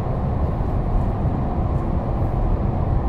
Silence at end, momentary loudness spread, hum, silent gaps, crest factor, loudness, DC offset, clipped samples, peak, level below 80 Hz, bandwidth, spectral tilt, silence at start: 0 s; 1 LU; none; none; 12 dB; -23 LUFS; under 0.1%; under 0.1%; -8 dBFS; -24 dBFS; 4.8 kHz; -10.5 dB/octave; 0 s